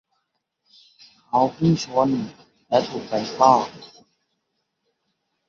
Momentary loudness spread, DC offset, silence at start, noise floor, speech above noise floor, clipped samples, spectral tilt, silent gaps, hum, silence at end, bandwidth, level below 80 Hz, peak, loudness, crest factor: 11 LU; under 0.1%; 1.35 s; -76 dBFS; 55 dB; under 0.1%; -6.5 dB/octave; none; none; 1.6 s; 7.6 kHz; -62 dBFS; -2 dBFS; -21 LUFS; 22 dB